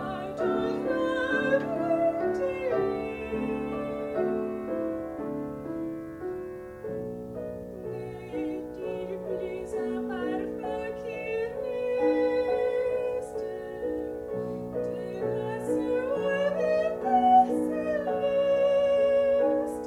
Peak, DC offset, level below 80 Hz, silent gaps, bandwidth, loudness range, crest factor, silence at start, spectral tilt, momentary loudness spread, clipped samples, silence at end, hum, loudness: -10 dBFS; under 0.1%; -56 dBFS; none; 13.5 kHz; 11 LU; 18 dB; 0 s; -6.5 dB/octave; 12 LU; under 0.1%; 0 s; none; -29 LUFS